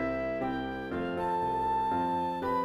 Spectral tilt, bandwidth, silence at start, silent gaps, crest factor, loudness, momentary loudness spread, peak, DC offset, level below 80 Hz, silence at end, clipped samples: -7 dB/octave; 13.5 kHz; 0 s; none; 12 dB; -31 LUFS; 5 LU; -20 dBFS; under 0.1%; -52 dBFS; 0 s; under 0.1%